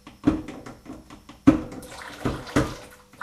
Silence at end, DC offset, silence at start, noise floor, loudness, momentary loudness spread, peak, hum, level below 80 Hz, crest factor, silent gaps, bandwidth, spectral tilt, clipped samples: 0.3 s; under 0.1%; 0.05 s; -47 dBFS; -25 LUFS; 23 LU; -2 dBFS; none; -42 dBFS; 26 dB; none; 14 kHz; -6.5 dB/octave; under 0.1%